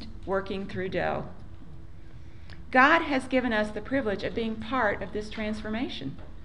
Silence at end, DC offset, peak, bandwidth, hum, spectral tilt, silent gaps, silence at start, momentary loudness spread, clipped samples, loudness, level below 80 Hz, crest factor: 0 s; 0.9%; -6 dBFS; 11 kHz; none; -6 dB/octave; none; 0 s; 26 LU; under 0.1%; -28 LUFS; -48 dBFS; 24 dB